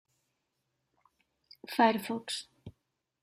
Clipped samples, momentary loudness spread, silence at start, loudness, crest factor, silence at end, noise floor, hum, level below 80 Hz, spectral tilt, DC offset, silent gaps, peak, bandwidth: under 0.1%; 23 LU; 1.7 s; -31 LUFS; 22 dB; 0.55 s; -82 dBFS; none; -76 dBFS; -4 dB/octave; under 0.1%; none; -14 dBFS; 15.5 kHz